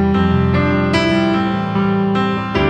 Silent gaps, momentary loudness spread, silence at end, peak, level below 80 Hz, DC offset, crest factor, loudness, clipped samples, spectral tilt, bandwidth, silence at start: none; 3 LU; 0 s; 0 dBFS; -34 dBFS; under 0.1%; 14 dB; -16 LUFS; under 0.1%; -7.5 dB/octave; 9 kHz; 0 s